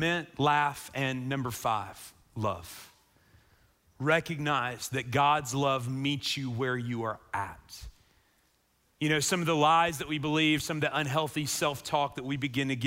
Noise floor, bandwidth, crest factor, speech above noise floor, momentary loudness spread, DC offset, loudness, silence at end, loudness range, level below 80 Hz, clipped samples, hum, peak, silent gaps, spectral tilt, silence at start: -70 dBFS; 16 kHz; 20 dB; 41 dB; 10 LU; under 0.1%; -29 LUFS; 0 s; 6 LU; -60 dBFS; under 0.1%; none; -12 dBFS; none; -4 dB/octave; 0 s